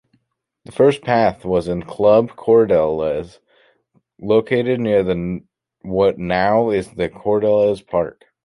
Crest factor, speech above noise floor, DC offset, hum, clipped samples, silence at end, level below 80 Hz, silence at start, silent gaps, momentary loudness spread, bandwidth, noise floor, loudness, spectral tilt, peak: 16 dB; 53 dB; under 0.1%; none; under 0.1%; 0.35 s; -46 dBFS; 0.7 s; none; 12 LU; 11.5 kHz; -70 dBFS; -18 LUFS; -7.5 dB/octave; -2 dBFS